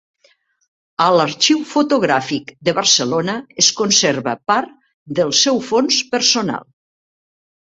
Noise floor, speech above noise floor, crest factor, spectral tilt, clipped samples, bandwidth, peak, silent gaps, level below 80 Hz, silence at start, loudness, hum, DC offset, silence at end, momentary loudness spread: -58 dBFS; 41 dB; 18 dB; -2.5 dB/octave; under 0.1%; 8.2 kHz; 0 dBFS; 4.94-5.06 s; -62 dBFS; 1 s; -15 LUFS; none; under 0.1%; 1.1 s; 10 LU